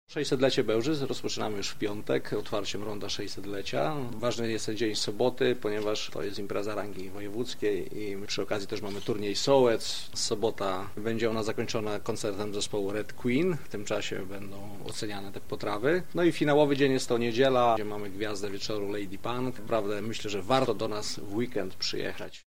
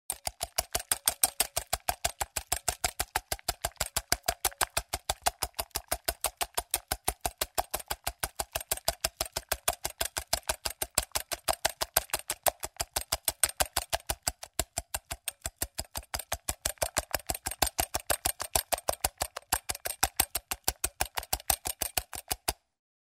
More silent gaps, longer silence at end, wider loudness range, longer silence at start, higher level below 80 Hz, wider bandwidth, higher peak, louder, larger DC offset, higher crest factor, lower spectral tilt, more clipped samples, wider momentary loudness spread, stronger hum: neither; second, 0 s vs 0.55 s; first, 6 LU vs 3 LU; about the same, 0.05 s vs 0.1 s; second, -60 dBFS vs -48 dBFS; about the same, 16 kHz vs 16.5 kHz; second, -8 dBFS vs -2 dBFS; about the same, -30 LUFS vs -32 LUFS; first, 2% vs under 0.1%; second, 22 dB vs 32 dB; first, -4.5 dB/octave vs -1 dB/octave; neither; first, 11 LU vs 7 LU; neither